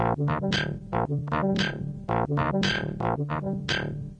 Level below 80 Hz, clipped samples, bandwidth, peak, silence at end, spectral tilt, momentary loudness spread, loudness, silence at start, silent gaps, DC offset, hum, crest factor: -46 dBFS; under 0.1%; 8.6 kHz; -14 dBFS; 0 s; -6 dB/octave; 5 LU; -27 LUFS; 0 s; none; under 0.1%; none; 14 dB